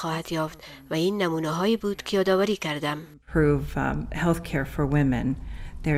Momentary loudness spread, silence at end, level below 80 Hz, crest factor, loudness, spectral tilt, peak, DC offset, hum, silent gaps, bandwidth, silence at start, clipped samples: 9 LU; 0 s; -40 dBFS; 16 dB; -26 LUFS; -6.5 dB/octave; -10 dBFS; under 0.1%; none; none; 16 kHz; 0 s; under 0.1%